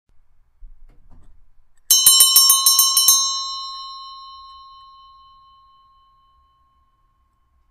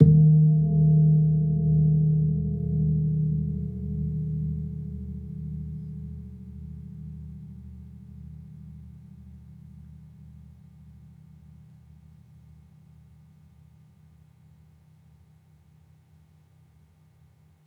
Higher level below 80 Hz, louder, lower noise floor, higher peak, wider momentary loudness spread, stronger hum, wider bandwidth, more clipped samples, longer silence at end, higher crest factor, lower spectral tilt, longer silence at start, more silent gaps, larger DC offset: second, -52 dBFS vs -46 dBFS; first, -11 LUFS vs -24 LUFS; first, -62 dBFS vs -58 dBFS; about the same, 0 dBFS vs -2 dBFS; second, 24 LU vs 28 LU; neither; first, 15.5 kHz vs 0.8 kHz; neither; second, 3.35 s vs 7.85 s; about the same, 20 dB vs 24 dB; second, 4 dB/octave vs -14 dB/octave; first, 0.65 s vs 0 s; neither; neither